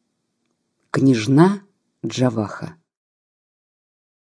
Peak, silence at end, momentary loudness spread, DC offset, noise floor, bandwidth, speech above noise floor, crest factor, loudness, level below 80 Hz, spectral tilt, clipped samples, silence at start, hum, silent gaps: -2 dBFS; 1.65 s; 18 LU; under 0.1%; -72 dBFS; 11 kHz; 55 dB; 20 dB; -19 LUFS; -66 dBFS; -7 dB/octave; under 0.1%; 0.95 s; none; none